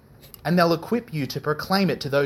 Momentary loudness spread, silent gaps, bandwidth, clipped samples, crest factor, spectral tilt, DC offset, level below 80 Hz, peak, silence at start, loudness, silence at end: 8 LU; none; 16 kHz; under 0.1%; 20 dB; -6 dB/octave; under 0.1%; -56 dBFS; -4 dBFS; 0.25 s; -23 LUFS; 0 s